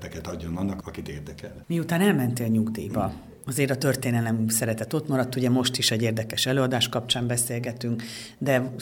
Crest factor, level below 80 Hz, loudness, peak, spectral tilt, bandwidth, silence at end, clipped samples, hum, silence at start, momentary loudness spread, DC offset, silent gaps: 18 dB; -52 dBFS; -25 LUFS; -8 dBFS; -4.5 dB/octave; 18 kHz; 0 s; under 0.1%; none; 0 s; 13 LU; under 0.1%; none